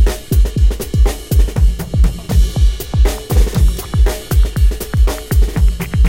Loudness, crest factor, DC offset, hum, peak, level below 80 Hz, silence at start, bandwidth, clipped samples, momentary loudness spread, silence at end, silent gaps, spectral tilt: -16 LUFS; 12 dB; under 0.1%; none; 0 dBFS; -12 dBFS; 0 s; 16.5 kHz; under 0.1%; 3 LU; 0 s; none; -6 dB/octave